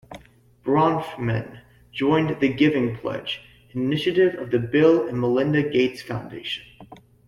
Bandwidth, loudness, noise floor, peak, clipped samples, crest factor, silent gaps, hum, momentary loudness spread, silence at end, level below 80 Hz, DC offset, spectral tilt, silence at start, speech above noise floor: 12.5 kHz; -22 LUFS; -52 dBFS; -6 dBFS; under 0.1%; 16 dB; none; none; 14 LU; 0.35 s; -56 dBFS; under 0.1%; -7.5 dB/octave; 0.1 s; 31 dB